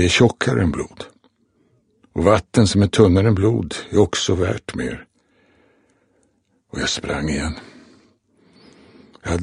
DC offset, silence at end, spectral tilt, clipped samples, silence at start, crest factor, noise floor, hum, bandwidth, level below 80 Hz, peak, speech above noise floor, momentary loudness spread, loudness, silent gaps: under 0.1%; 0 s; -5.5 dB/octave; under 0.1%; 0 s; 20 dB; -64 dBFS; none; 10.5 kHz; -40 dBFS; 0 dBFS; 46 dB; 18 LU; -19 LUFS; none